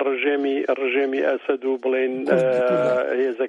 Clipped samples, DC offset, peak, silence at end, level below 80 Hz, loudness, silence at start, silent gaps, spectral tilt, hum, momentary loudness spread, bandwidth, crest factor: under 0.1%; under 0.1%; -4 dBFS; 0 s; -76 dBFS; -21 LUFS; 0 s; none; -6.5 dB/octave; none; 4 LU; 8 kHz; 16 dB